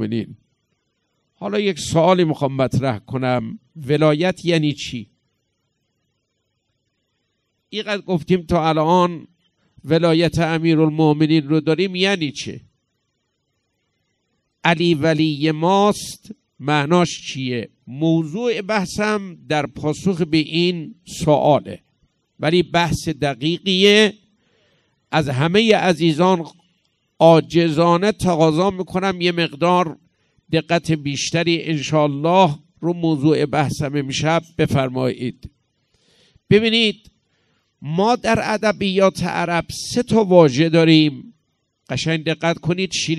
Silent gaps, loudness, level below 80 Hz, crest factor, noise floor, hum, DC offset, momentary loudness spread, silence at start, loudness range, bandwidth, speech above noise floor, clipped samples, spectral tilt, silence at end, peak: none; -18 LUFS; -50 dBFS; 18 dB; -72 dBFS; none; under 0.1%; 11 LU; 0 s; 5 LU; 13 kHz; 54 dB; under 0.1%; -5.5 dB/octave; 0 s; 0 dBFS